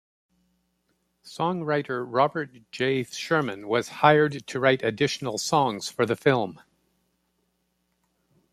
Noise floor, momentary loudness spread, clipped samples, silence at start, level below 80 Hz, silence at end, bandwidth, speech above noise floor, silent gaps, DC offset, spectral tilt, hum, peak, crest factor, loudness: -74 dBFS; 8 LU; under 0.1%; 1.25 s; -68 dBFS; 2 s; 15 kHz; 49 dB; none; under 0.1%; -5 dB/octave; none; -4 dBFS; 22 dB; -25 LUFS